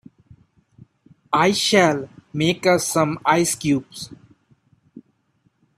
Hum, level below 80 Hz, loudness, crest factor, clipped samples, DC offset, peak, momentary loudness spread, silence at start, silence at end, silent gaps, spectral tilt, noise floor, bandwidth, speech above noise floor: none; -60 dBFS; -19 LUFS; 20 dB; under 0.1%; under 0.1%; -2 dBFS; 16 LU; 1.3 s; 0.75 s; none; -4 dB/octave; -65 dBFS; 15.5 kHz; 46 dB